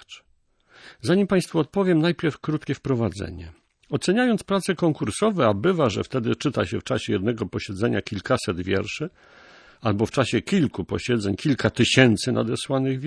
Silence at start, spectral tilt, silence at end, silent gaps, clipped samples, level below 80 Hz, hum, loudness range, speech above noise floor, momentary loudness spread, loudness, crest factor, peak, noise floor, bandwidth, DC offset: 0.1 s; -5.5 dB/octave; 0 s; none; under 0.1%; -52 dBFS; none; 4 LU; 41 dB; 8 LU; -23 LUFS; 20 dB; -2 dBFS; -63 dBFS; 11 kHz; under 0.1%